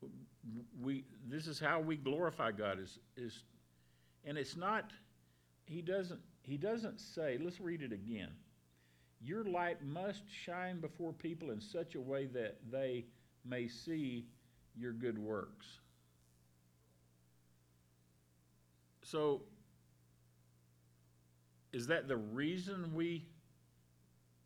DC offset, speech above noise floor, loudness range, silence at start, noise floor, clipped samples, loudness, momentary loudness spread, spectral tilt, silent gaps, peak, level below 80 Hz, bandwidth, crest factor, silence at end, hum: under 0.1%; 30 dB; 5 LU; 0 s; -72 dBFS; under 0.1%; -43 LUFS; 17 LU; -6 dB/octave; none; -22 dBFS; -78 dBFS; 19.5 kHz; 22 dB; 1.05 s; 60 Hz at -70 dBFS